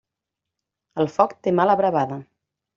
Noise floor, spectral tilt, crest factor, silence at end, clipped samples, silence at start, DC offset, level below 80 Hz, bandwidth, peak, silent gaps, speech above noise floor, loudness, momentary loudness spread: -85 dBFS; -6 dB/octave; 20 dB; 0.55 s; under 0.1%; 0.95 s; under 0.1%; -66 dBFS; 7.4 kHz; -2 dBFS; none; 65 dB; -21 LUFS; 13 LU